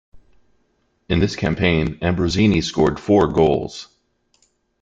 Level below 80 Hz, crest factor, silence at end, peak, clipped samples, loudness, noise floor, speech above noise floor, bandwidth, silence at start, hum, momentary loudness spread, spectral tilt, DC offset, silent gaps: -40 dBFS; 18 dB; 1 s; -2 dBFS; under 0.1%; -18 LUFS; -65 dBFS; 48 dB; 8.6 kHz; 0.15 s; none; 7 LU; -6.5 dB/octave; under 0.1%; none